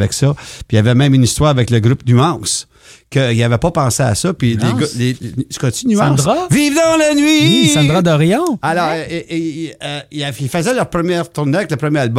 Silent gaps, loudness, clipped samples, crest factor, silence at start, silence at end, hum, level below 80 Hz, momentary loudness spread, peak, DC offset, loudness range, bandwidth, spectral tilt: none; -14 LUFS; under 0.1%; 14 dB; 0 s; 0 s; none; -40 dBFS; 10 LU; 0 dBFS; under 0.1%; 5 LU; 15.5 kHz; -5 dB/octave